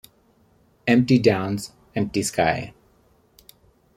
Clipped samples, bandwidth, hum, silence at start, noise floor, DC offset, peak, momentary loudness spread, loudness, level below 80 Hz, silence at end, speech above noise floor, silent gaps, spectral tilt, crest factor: under 0.1%; 15.5 kHz; none; 0.85 s; -60 dBFS; under 0.1%; -4 dBFS; 13 LU; -22 LUFS; -54 dBFS; 1.25 s; 39 dB; none; -5.5 dB/octave; 20 dB